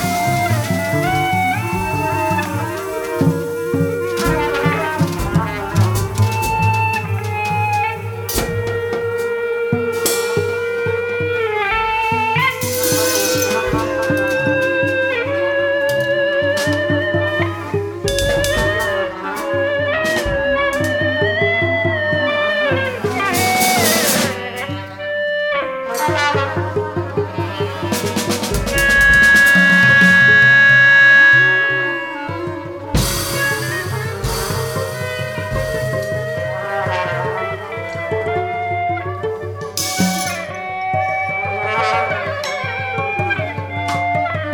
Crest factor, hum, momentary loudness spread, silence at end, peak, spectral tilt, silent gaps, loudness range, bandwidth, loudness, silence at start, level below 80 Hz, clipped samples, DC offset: 16 dB; none; 13 LU; 0 s; -2 dBFS; -4 dB/octave; none; 11 LU; 19 kHz; -16 LUFS; 0 s; -36 dBFS; under 0.1%; under 0.1%